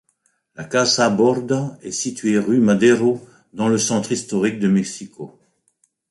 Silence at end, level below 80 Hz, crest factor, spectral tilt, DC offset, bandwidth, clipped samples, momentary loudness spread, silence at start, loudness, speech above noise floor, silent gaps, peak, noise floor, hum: 0.85 s; -60 dBFS; 16 dB; -4.5 dB/octave; under 0.1%; 11.5 kHz; under 0.1%; 18 LU; 0.6 s; -18 LUFS; 48 dB; none; -2 dBFS; -66 dBFS; none